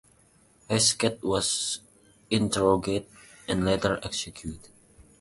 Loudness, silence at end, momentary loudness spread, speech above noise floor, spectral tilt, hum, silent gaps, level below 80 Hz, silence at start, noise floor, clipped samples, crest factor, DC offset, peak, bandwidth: -26 LUFS; 0.2 s; 15 LU; 34 dB; -3.5 dB/octave; none; none; -50 dBFS; 0.7 s; -61 dBFS; under 0.1%; 20 dB; under 0.1%; -8 dBFS; 11.5 kHz